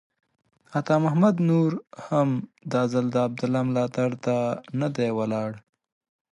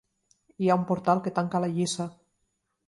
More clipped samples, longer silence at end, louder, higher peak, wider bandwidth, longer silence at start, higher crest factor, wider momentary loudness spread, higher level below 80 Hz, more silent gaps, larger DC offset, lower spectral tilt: neither; about the same, 0.75 s vs 0.75 s; about the same, -25 LUFS vs -27 LUFS; about the same, -8 dBFS vs -8 dBFS; about the same, 11 kHz vs 11.5 kHz; about the same, 0.7 s vs 0.6 s; about the same, 16 dB vs 20 dB; first, 10 LU vs 6 LU; about the same, -70 dBFS vs -70 dBFS; neither; neither; first, -8 dB/octave vs -6 dB/octave